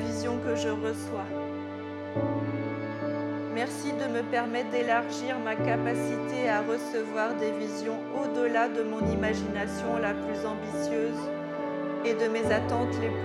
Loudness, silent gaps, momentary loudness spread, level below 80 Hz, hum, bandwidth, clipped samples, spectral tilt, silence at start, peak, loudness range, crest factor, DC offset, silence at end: -30 LUFS; none; 7 LU; -60 dBFS; none; 13 kHz; under 0.1%; -6 dB/octave; 0 s; -12 dBFS; 3 LU; 16 dB; under 0.1%; 0 s